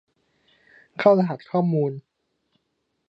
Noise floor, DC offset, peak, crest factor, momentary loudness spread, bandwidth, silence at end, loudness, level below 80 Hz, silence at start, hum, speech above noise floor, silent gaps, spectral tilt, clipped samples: -75 dBFS; under 0.1%; -4 dBFS; 22 dB; 18 LU; 6 kHz; 1.1 s; -22 LUFS; -76 dBFS; 1 s; none; 54 dB; none; -9.5 dB/octave; under 0.1%